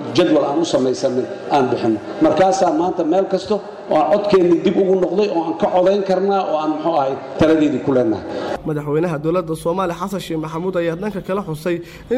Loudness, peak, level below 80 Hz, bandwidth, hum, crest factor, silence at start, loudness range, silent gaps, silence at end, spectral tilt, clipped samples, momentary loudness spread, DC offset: -18 LUFS; -6 dBFS; -50 dBFS; 15 kHz; none; 10 dB; 0 s; 5 LU; none; 0 s; -6.5 dB/octave; under 0.1%; 9 LU; under 0.1%